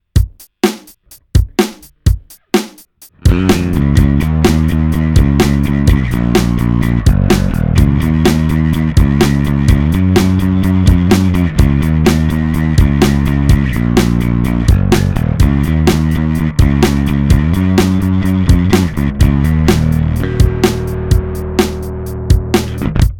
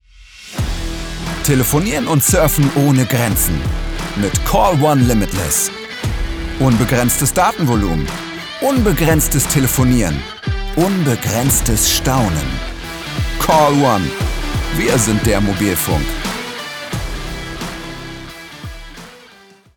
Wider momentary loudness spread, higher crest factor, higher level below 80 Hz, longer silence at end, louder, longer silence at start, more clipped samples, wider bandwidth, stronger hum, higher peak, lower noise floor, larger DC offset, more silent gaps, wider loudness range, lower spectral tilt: second, 5 LU vs 13 LU; about the same, 12 dB vs 16 dB; first, -18 dBFS vs -26 dBFS; second, 0 s vs 0.6 s; first, -13 LUFS vs -16 LUFS; about the same, 0.15 s vs 0.2 s; neither; second, 18 kHz vs over 20 kHz; neither; about the same, 0 dBFS vs 0 dBFS; about the same, -42 dBFS vs -45 dBFS; neither; neither; about the same, 3 LU vs 4 LU; first, -7 dB/octave vs -4.5 dB/octave